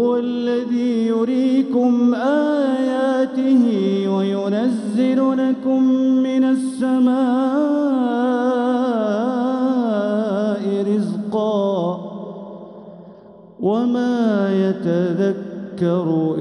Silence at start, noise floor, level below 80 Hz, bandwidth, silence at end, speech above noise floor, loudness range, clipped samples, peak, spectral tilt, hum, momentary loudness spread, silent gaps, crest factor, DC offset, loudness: 0 s; -43 dBFS; -70 dBFS; 10.5 kHz; 0 s; 25 dB; 5 LU; under 0.1%; -6 dBFS; -7.5 dB/octave; none; 6 LU; none; 12 dB; under 0.1%; -18 LUFS